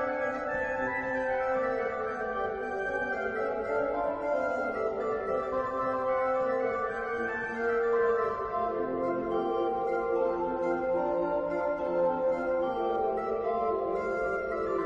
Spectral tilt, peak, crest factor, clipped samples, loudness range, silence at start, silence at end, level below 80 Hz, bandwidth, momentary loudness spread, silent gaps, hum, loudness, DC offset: -7 dB/octave; -18 dBFS; 12 dB; under 0.1%; 2 LU; 0 s; 0 s; -56 dBFS; 7.4 kHz; 4 LU; none; none; -30 LUFS; under 0.1%